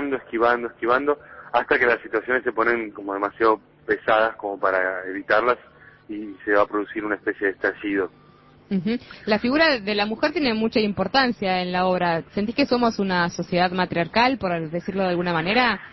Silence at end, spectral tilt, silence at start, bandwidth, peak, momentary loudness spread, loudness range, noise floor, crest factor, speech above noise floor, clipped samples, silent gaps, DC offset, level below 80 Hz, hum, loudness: 0.05 s; -6 dB/octave; 0 s; 6.2 kHz; -6 dBFS; 8 LU; 3 LU; -52 dBFS; 18 dB; 29 dB; under 0.1%; none; under 0.1%; -54 dBFS; none; -22 LUFS